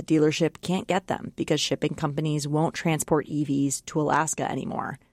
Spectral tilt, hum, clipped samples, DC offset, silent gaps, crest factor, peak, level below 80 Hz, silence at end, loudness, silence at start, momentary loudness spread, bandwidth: -5 dB/octave; none; under 0.1%; under 0.1%; none; 16 dB; -10 dBFS; -58 dBFS; 0.15 s; -26 LUFS; 0 s; 6 LU; 15.5 kHz